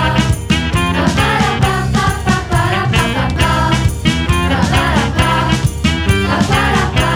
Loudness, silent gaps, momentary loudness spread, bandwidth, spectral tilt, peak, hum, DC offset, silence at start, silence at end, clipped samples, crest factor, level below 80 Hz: -14 LUFS; none; 2 LU; 17 kHz; -5 dB/octave; 0 dBFS; none; under 0.1%; 0 s; 0 s; under 0.1%; 12 dB; -22 dBFS